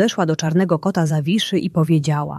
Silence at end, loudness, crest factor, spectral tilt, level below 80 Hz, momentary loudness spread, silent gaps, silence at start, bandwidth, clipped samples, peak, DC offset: 0 s; -18 LUFS; 14 dB; -6 dB/octave; -58 dBFS; 2 LU; none; 0 s; 13 kHz; under 0.1%; -2 dBFS; under 0.1%